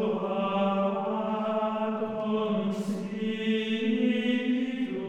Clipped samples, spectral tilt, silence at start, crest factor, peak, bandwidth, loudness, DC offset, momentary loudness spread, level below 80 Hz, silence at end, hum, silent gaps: under 0.1%; -7 dB/octave; 0 s; 12 dB; -16 dBFS; 10 kHz; -29 LUFS; under 0.1%; 5 LU; -68 dBFS; 0 s; none; none